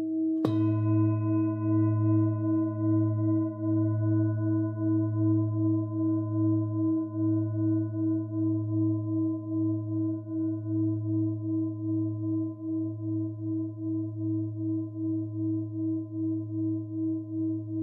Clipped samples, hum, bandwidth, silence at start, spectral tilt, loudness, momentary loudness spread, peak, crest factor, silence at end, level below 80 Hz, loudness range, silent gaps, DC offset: under 0.1%; none; 4 kHz; 0 s; -12.5 dB/octave; -29 LUFS; 6 LU; -10 dBFS; 18 dB; 0 s; -74 dBFS; 5 LU; none; under 0.1%